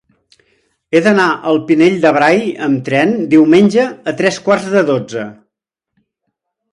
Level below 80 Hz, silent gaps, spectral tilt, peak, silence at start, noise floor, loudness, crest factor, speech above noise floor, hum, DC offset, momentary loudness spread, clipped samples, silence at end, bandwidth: -58 dBFS; none; -6 dB/octave; 0 dBFS; 0.9 s; -78 dBFS; -12 LUFS; 14 dB; 66 dB; none; under 0.1%; 8 LU; under 0.1%; 1.4 s; 11 kHz